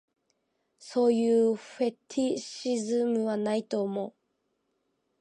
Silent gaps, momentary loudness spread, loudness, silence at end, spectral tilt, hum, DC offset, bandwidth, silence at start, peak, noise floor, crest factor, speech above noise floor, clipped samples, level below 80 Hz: none; 9 LU; -29 LUFS; 1.1 s; -5.5 dB/octave; none; under 0.1%; 10.5 kHz; 0.8 s; -14 dBFS; -77 dBFS; 16 dB; 50 dB; under 0.1%; -80 dBFS